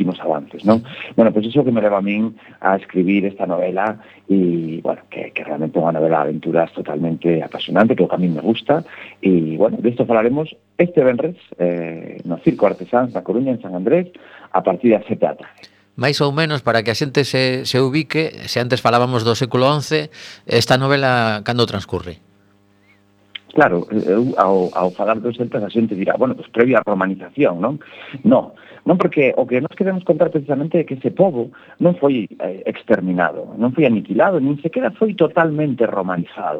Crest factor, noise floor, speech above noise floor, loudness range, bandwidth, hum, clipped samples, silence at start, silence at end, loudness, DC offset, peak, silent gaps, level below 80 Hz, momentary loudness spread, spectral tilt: 18 dB; -55 dBFS; 37 dB; 2 LU; 15 kHz; none; under 0.1%; 0 s; 0 s; -18 LUFS; under 0.1%; 0 dBFS; none; -58 dBFS; 8 LU; -6.5 dB/octave